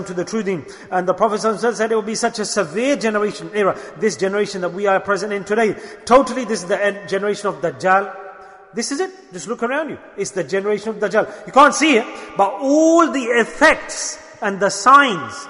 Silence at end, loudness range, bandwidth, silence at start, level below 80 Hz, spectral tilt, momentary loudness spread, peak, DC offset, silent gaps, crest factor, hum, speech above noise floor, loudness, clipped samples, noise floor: 0 s; 7 LU; 11 kHz; 0 s; -54 dBFS; -3.5 dB/octave; 12 LU; 0 dBFS; under 0.1%; none; 18 dB; none; 21 dB; -18 LUFS; under 0.1%; -39 dBFS